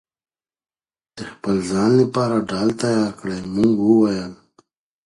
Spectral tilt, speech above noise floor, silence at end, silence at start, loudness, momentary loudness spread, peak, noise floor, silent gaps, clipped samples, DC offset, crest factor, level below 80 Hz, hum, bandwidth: -6.5 dB/octave; 41 dB; 0.7 s; 1.15 s; -19 LUFS; 13 LU; -4 dBFS; -59 dBFS; none; under 0.1%; under 0.1%; 16 dB; -54 dBFS; none; 11.5 kHz